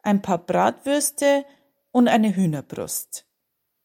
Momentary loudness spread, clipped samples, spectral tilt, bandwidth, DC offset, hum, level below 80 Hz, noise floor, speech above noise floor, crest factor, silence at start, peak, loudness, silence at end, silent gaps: 11 LU; under 0.1%; -5 dB/octave; 16.5 kHz; under 0.1%; none; -66 dBFS; -77 dBFS; 56 dB; 16 dB; 0.05 s; -6 dBFS; -22 LUFS; 0.65 s; none